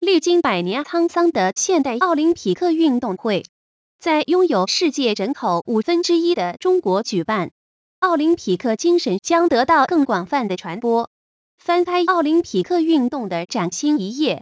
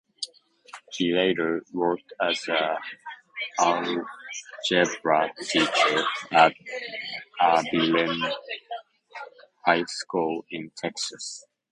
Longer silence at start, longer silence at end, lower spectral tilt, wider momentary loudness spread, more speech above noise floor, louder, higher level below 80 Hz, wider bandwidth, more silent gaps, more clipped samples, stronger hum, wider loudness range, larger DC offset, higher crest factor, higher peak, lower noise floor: second, 0 s vs 0.2 s; second, 0 s vs 0.3 s; first, -4.5 dB/octave vs -3 dB/octave; second, 6 LU vs 17 LU; first, over 72 dB vs 24 dB; first, -19 LUFS vs -25 LUFS; first, -62 dBFS vs -70 dBFS; second, 8 kHz vs 11 kHz; first, 3.49-3.99 s, 7.51-8.02 s, 11.07-11.58 s vs none; neither; neither; second, 2 LU vs 5 LU; neither; second, 14 dB vs 24 dB; about the same, -4 dBFS vs -2 dBFS; first, under -90 dBFS vs -49 dBFS